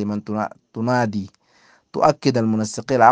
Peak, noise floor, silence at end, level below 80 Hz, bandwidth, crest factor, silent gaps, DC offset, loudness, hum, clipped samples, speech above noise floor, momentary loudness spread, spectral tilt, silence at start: 0 dBFS; -56 dBFS; 0 s; -60 dBFS; 9.8 kHz; 20 dB; none; under 0.1%; -21 LUFS; none; under 0.1%; 37 dB; 12 LU; -6 dB/octave; 0 s